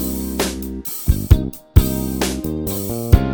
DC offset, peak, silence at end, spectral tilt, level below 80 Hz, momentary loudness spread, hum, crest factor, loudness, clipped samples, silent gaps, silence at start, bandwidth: under 0.1%; 0 dBFS; 0 s; -6 dB/octave; -22 dBFS; 7 LU; none; 18 dB; -20 LUFS; 0.4%; none; 0 s; over 20 kHz